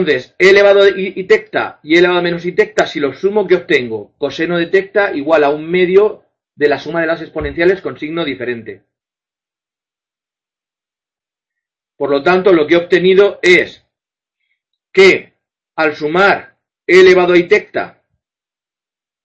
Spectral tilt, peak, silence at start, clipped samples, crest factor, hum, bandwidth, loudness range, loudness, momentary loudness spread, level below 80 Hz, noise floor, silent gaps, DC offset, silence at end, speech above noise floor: -5.5 dB/octave; 0 dBFS; 0 s; 0.1%; 14 dB; none; 8.2 kHz; 9 LU; -12 LUFS; 13 LU; -48 dBFS; -90 dBFS; none; under 0.1%; 1.35 s; 78 dB